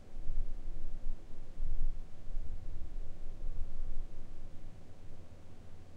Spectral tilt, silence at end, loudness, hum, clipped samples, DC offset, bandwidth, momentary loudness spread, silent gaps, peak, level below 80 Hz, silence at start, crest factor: -7 dB/octave; 0 s; -48 LUFS; none; under 0.1%; under 0.1%; 1.3 kHz; 12 LU; none; -18 dBFS; -36 dBFS; 0 s; 14 dB